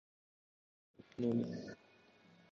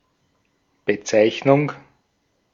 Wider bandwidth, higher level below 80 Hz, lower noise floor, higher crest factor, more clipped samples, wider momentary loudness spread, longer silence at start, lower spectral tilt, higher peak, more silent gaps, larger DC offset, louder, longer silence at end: about the same, 6.8 kHz vs 7.4 kHz; second, -78 dBFS vs -66 dBFS; about the same, -67 dBFS vs -68 dBFS; about the same, 20 dB vs 20 dB; neither; first, 18 LU vs 12 LU; first, 1 s vs 0.85 s; first, -8 dB/octave vs -5.5 dB/octave; second, -26 dBFS vs -2 dBFS; neither; neither; second, -40 LUFS vs -20 LUFS; about the same, 0.75 s vs 0.75 s